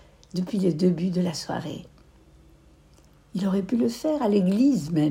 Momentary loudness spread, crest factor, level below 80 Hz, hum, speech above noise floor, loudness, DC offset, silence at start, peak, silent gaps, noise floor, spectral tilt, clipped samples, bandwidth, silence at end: 12 LU; 14 dB; -56 dBFS; none; 32 dB; -25 LUFS; under 0.1%; 0.35 s; -10 dBFS; none; -55 dBFS; -7 dB/octave; under 0.1%; 16 kHz; 0 s